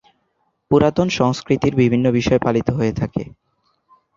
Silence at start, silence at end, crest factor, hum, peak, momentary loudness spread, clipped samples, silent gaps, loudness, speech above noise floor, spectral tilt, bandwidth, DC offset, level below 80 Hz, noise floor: 0.7 s; 0.85 s; 16 dB; none; -2 dBFS; 9 LU; under 0.1%; none; -18 LUFS; 51 dB; -7 dB/octave; 7.6 kHz; under 0.1%; -44 dBFS; -68 dBFS